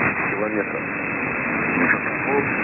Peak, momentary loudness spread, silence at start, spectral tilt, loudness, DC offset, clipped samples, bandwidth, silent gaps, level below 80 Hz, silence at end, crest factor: -6 dBFS; 6 LU; 0 s; -11.5 dB/octave; -21 LUFS; under 0.1%; under 0.1%; 2.9 kHz; none; -50 dBFS; 0 s; 16 dB